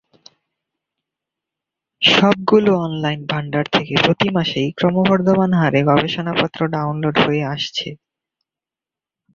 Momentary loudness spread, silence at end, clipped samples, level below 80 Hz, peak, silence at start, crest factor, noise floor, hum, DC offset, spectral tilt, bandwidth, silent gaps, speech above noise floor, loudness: 8 LU; 1.4 s; under 0.1%; -54 dBFS; 0 dBFS; 2 s; 18 dB; -89 dBFS; none; under 0.1%; -6 dB/octave; 7.4 kHz; none; 72 dB; -17 LUFS